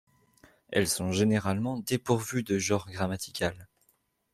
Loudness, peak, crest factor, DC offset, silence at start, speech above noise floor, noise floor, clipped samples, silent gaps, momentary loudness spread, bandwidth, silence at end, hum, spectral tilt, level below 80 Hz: -29 LUFS; -10 dBFS; 20 dB; under 0.1%; 0.7 s; 43 dB; -71 dBFS; under 0.1%; none; 7 LU; 15.5 kHz; 0.7 s; none; -4.5 dB/octave; -62 dBFS